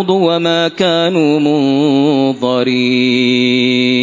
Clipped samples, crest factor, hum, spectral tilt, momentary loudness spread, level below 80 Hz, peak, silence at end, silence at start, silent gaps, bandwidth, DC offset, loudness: under 0.1%; 12 dB; none; -5.5 dB/octave; 2 LU; -60 dBFS; 0 dBFS; 0 s; 0 s; none; 7.6 kHz; under 0.1%; -12 LUFS